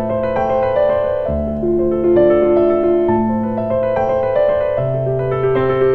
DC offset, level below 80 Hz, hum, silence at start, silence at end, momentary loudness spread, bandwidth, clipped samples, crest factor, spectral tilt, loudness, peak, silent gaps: under 0.1%; -36 dBFS; none; 0 s; 0 s; 6 LU; 4.3 kHz; under 0.1%; 12 dB; -10 dB/octave; -16 LUFS; -2 dBFS; none